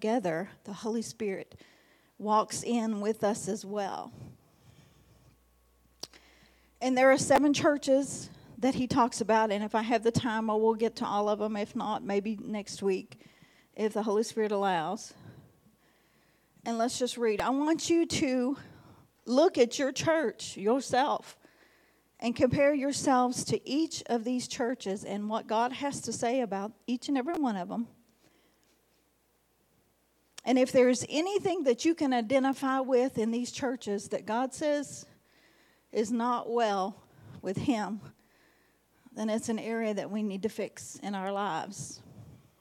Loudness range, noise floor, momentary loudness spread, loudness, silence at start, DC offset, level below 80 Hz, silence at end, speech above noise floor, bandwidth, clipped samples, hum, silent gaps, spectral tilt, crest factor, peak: 7 LU; -71 dBFS; 13 LU; -30 LUFS; 0 s; under 0.1%; -68 dBFS; 0.25 s; 42 dB; 16 kHz; under 0.1%; none; none; -4.5 dB/octave; 20 dB; -12 dBFS